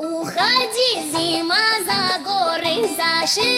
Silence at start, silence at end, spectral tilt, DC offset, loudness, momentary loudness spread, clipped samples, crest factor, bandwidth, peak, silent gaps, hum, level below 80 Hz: 0 s; 0 s; -1.5 dB/octave; under 0.1%; -18 LUFS; 4 LU; under 0.1%; 16 dB; 17 kHz; -4 dBFS; none; none; -60 dBFS